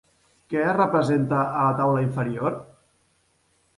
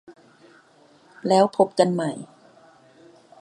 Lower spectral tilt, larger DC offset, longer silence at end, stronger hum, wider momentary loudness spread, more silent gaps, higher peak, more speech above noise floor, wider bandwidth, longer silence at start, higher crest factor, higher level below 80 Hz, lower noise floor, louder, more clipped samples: first, -8.5 dB/octave vs -6 dB/octave; neither; about the same, 1.15 s vs 1.15 s; neither; second, 8 LU vs 18 LU; neither; second, -8 dBFS vs -2 dBFS; first, 44 dB vs 35 dB; about the same, 11.5 kHz vs 11.5 kHz; first, 0.5 s vs 0.1 s; second, 16 dB vs 22 dB; first, -62 dBFS vs -76 dBFS; first, -66 dBFS vs -55 dBFS; about the same, -23 LUFS vs -21 LUFS; neither